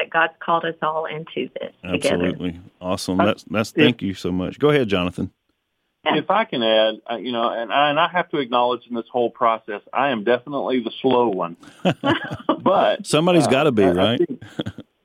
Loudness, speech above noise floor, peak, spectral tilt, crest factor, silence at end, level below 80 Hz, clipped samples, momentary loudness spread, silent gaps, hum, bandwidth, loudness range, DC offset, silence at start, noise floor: -20 LUFS; 53 dB; 0 dBFS; -5.5 dB/octave; 20 dB; 0.25 s; -58 dBFS; under 0.1%; 11 LU; none; none; 16 kHz; 3 LU; under 0.1%; 0 s; -73 dBFS